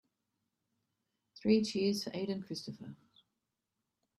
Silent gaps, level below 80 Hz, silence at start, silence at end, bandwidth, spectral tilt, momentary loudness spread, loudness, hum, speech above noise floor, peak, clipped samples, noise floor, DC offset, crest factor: none; -76 dBFS; 1.35 s; 1.25 s; 13.5 kHz; -5.5 dB/octave; 18 LU; -35 LUFS; none; 53 dB; -16 dBFS; under 0.1%; -88 dBFS; under 0.1%; 22 dB